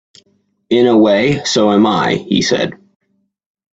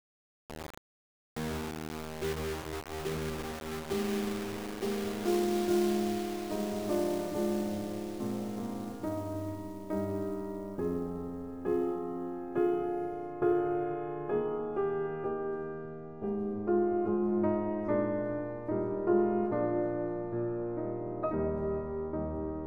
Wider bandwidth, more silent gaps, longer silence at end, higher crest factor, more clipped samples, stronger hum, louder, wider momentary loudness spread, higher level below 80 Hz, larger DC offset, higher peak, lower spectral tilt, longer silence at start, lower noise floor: second, 8 kHz vs over 20 kHz; second, none vs 0.77-1.36 s; first, 1.05 s vs 0 s; about the same, 14 dB vs 18 dB; neither; neither; first, -13 LUFS vs -34 LUFS; about the same, 7 LU vs 9 LU; about the same, -50 dBFS vs -54 dBFS; second, under 0.1% vs 0.2%; first, 0 dBFS vs -16 dBFS; second, -5 dB/octave vs -6.5 dB/octave; first, 0.7 s vs 0.5 s; second, -59 dBFS vs under -90 dBFS